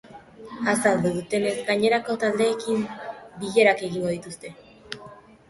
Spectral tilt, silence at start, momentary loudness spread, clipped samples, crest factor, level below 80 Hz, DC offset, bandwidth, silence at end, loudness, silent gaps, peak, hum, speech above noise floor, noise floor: -4.5 dB/octave; 0.05 s; 19 LU; under 0.1%; 20 dB; -62 dBFS; under 0.1%; 12 kHz; 0.3 s; -23 LUFS; none; -4 dBFS; none; 23 dB; -46 dBFS